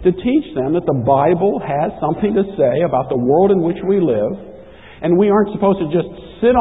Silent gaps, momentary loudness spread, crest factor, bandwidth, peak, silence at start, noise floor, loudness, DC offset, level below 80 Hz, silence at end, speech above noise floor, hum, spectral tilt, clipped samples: none; 6 LU; 14 dB; 4 kHz; -2 dBFS; 0 s; -39 dBFS; -16 LUFS; 0.4%; -42 dBFS; 0 s; 23 dB; none; -11.5 dB/octave; under 0.1%